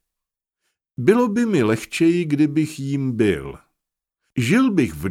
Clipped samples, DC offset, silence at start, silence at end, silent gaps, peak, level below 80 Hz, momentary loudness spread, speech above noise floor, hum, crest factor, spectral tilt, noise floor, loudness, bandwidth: under 0.1%; under 0.1%; 1 s; 0 s; none; -2 dBFS; -50 dBFS; 9 LU; 67 dB; none; 18 dB; -6.5 dB/octave; -85 dBFS; -19 LUFS; 16 kHz